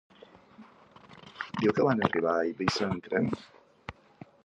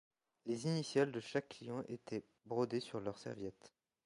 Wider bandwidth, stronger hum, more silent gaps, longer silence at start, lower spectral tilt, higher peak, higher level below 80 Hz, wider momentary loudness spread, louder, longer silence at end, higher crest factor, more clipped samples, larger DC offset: about the same, 10.5 kHz vs 11.5 kHz; neither; neither; first, 0.6 s vs 0.45 s; about the same, -6 dB/octave vs -6 dB/octave; first, -6 dBFS vs -22 dBFS; first, -60 dBFS vs -78 dBFS; first, 21 LU vs 11 LU; first, -29 LUFS vs -42 LUFS; first, 0.55 s vs 0.35 s; about the same, 24 dB vs 20 dB; neither; neither